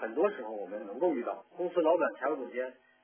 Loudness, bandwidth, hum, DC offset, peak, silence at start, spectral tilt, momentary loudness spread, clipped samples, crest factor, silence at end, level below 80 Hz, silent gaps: -33 LUFS; 3.5 kHz; none; under 0.1%; -16 dBFS; 0 s; -4 dB/octave; 12 LU; under 0.1%; 18 dB; 0.3 s; under -90 dBFS; none